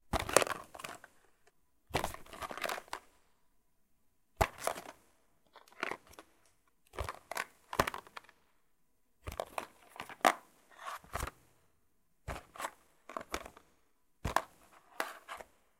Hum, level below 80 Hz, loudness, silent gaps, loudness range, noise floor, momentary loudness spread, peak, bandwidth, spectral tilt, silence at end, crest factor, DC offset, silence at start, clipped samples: none; -54 dBFS; -39 LUFS; none; 6 LU; -78 dBFS; 20 LU; 0 dBFS; 16.5 kHz; -3 dB/octave; 0.35 s; 40 dB; under 0.1%; 0.1 s; under 0.1%